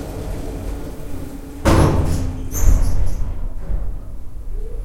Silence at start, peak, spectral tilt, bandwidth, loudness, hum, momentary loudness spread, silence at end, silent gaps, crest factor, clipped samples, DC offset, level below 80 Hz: 0 s; 0 dBFS; -6 dB/octave; 16 kHz; -22 LUFS; none; 17 LU; 0 s; none; 18 dB; under 0.1%; under 0.1%; -22 dBFS